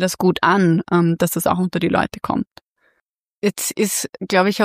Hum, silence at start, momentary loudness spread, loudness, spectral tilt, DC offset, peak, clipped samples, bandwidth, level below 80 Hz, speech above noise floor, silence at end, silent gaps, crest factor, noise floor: none; 0 s; 8 LU; -19 LUFS; -5 dB/octave; under 0.1%; -2 dBFS; under 0.1%; 15.5 kHz; -52 dBFS; 54 dB; 0 s; 2.71-2.75 s, 3.02-3.06 s, 3.14-3.18 s, 3.32-3.37 s; 16 dB; -72 dBFS